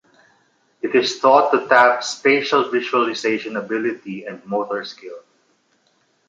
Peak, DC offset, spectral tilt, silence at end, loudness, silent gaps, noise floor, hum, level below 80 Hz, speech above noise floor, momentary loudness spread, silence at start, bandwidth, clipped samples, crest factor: -2 dBFS; under 0.1%; -3.5 dB/octave; 1.1 s; -18 LUFS; none; -63 dBFS; none; -72 dBFS; 45 dB; 17 LU; 0.85 s; 9.2 kHz; under 0.1%; 18 dB